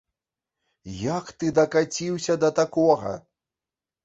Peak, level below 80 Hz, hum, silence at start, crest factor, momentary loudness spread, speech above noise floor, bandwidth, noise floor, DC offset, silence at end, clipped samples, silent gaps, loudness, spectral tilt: -6 dBFS; -58 dBFS; none; 0.85 s; 20 dB; 12 LU; over 67 dB; 8 kHz; under -90 dBFS; under 0.1%; 0.85 s; under 0.1%; none; -24 LUFS; -5 dB/octave